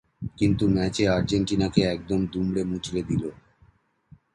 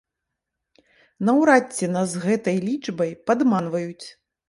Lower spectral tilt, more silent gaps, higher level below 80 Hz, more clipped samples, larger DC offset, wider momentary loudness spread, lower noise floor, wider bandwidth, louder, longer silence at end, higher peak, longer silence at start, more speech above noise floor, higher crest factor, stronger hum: about the same, -6.5 dB/octave vs -6 dB/octave; neither; first, -44 dBFS vs -68 dBFS; neither; neither; second, 7 LU vs 12 LU; second, -60 dBFS vs -83 dBFS; about the same, 11 kHz vs 11.5 kHz; second, -25 LUFS vs -22 LUFS; first, 1 s vs 0.4 s; about the same, -6 dBFS vs -4 dBFS; second, 0.2 s vs 1.2 s; second, 36 dB vs 61 dB; about the same, 20 dB vs 20 dB; neither